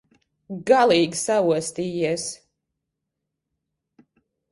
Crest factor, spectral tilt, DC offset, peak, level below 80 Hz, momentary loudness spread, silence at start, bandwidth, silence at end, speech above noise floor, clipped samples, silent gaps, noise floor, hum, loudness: 20 dB; -4 dB/octave; under 0.1%; -4 dBFS; -66 dBFS; 16 LU; 0.5 s; 11.5 kHz; 2.15 s; 61 dB; under 0.1%; none; -82 dBFS; none; -21 LUFS